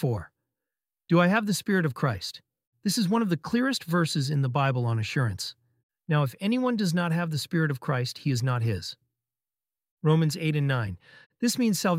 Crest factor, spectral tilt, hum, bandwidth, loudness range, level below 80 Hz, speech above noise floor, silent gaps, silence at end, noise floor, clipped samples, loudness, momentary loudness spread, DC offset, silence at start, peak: 20 dB; -5.5 dB/octave; none; 16 kHz; 2 LU; -62 dBFS; over 64 dB; 2.67-2.72 s, 5.83-5.89 s, 9.91-9.97 s, 11.26-11.30 s; 0 s; under -90 dBFS; under 0.1%; -27 LUFS; 8 LU; under 0.1%; 0 s; -8 dBFS